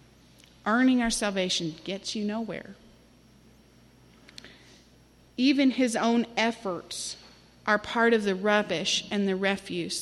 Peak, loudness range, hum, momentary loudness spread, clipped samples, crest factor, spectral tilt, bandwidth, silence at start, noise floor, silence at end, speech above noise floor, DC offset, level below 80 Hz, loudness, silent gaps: -10 dBFS; 12 LU; none; 14 LU; under 0.1%; 18 dB; -3.5 dB/octave; 12.5 kHz; 0.65 s; -57 dBFS; 0 s; 31 dB; under 0.1%; -58 dBFS; -27 LUFS; none